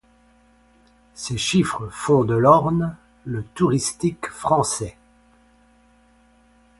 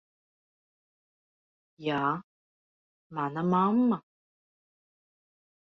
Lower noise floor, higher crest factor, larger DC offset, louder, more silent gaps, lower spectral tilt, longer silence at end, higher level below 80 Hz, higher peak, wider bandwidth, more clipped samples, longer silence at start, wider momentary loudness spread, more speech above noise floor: second, -56 dBFS vs under -90 dBFS; about the same, 22 dB vs 20 dB; neither; first, -21 LUFS vs -29 LUFS; second, none vs 2.24-3.10 s; second, -5.5 dB/octave vs -8.5 dB/octave; about the same, 1.9 s vs 1.8 s; first, -50 dBFS vs -76 dBFS; first, 0 dBFS vs -14 dBFS; first, 11.5 kHz vs 6.2 kHz; neither; second, 1.2 s vs 1.8 s; first, 16 LU vs 12 LU; second, 36 dB vs over 63 dB